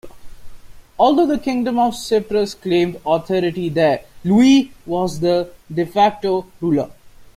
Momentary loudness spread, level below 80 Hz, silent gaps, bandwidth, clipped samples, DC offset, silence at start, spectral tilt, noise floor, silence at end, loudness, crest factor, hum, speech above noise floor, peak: 8 LU; -48 dBFS; none; 15.5 kHz; under 0.1%; under 0.1%; 0.05 s; -6 dB/octave; -36 dBFS; 0.1 s; -18 LUFS; 16 dB; none; 19 dB; -2 dBFS